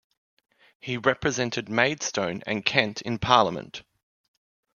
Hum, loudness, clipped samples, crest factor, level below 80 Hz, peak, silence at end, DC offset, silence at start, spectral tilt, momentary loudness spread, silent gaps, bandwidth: none; -25 LUFS; under 0.1%; 26 dB; -56 dBFS; 0 dBFS; 0.95 s; under 0.1%; 0.85 s; -3.5 dB/octave; 15 LU; none; 7.4 kHz